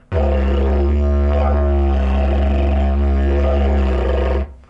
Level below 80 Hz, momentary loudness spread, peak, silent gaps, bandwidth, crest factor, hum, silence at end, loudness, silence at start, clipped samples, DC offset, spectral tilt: -16 dBFS; 2 LU; -4 dBFS; none; 5 kHz; 10 dB; none; 0.15 s; -17 LUFS; 0.1 s; under 0.1%; under 0.1%; -9.5 dB/octave